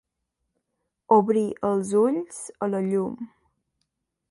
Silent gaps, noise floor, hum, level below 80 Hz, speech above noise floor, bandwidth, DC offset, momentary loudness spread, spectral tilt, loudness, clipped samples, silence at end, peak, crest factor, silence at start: none; -80 dBFS; none; -68 dBFS; 56 dB; 11.5 kHz; under 0.1%; 15 LU; -7 dB/octave; -24 LUFS; under 0.1%; 1.05 s; -6 dBFS; 20 dB; 1.1 s